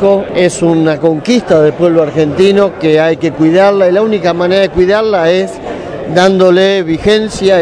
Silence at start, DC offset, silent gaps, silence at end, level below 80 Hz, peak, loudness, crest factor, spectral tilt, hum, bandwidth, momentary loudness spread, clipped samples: 0 s; under 0.1%; none; 0 s; -38 dBFS; 0 dBFS; -9 LUFS; 8 dB; -6 dB/octave; none; 11 kHz; 5 LU; 1%